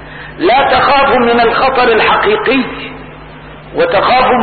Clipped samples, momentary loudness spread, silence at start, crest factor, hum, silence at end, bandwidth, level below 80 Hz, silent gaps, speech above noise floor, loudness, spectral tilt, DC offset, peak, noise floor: under 0.1%; 16 LU; 0 s; 10 dB; none; 0 s; 4.8 kHz; -36 dBFS; none; 22 dB; -10 LUFS; -10.5 dB/octave; under 0.1%; 0 dBFS; -31 dBFS